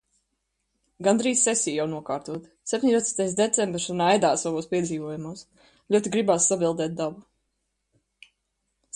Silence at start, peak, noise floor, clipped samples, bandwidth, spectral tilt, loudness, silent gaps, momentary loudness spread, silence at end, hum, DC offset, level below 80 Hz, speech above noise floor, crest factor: 1 s; -4 dBFS; -77 dBFS; under 0.1%; 11.5 kHz; -3.5 dB/octave; -24 LUFS; none; 12 LU; 1.75 s; none; under 0.1%; -64 dBFS; 53 dB; 22 dB